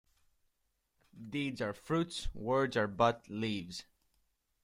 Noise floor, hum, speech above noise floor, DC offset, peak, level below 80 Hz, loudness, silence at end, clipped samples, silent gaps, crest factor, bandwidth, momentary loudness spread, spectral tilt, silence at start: -80 dBFS; none; 46 dB; under 0.1%; -14 dBFS; -54 dBFS; -35 LUFS; 0.8 s; under 0.1%; none; 22 dB; 16 kHz; 12 LU; -5.5 dB/octave; 1.15 s